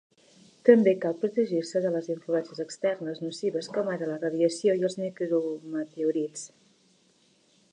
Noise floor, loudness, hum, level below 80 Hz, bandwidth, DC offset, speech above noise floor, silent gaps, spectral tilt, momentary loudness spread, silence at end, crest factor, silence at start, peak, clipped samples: -65 dBFS; -27 LUFS; none; -82 dBFS; 10.5 kHz; under 0.1%; 38 dB; none; -5.5 dB/octave; 13 LU; 1.25 s; 24 dB; 0.65 s; -4 dBFS; under 0.1%